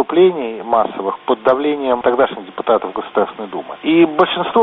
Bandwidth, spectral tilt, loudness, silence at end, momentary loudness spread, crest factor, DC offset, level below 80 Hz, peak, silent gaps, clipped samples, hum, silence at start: 4.1 kHz; -3.5 dB/octave; -16 LUFS; 0 s; 10 LU; 16 dB; under 0.1%; -56 dBFS; 0 dBFS; none; under 0.1%; none; 0 s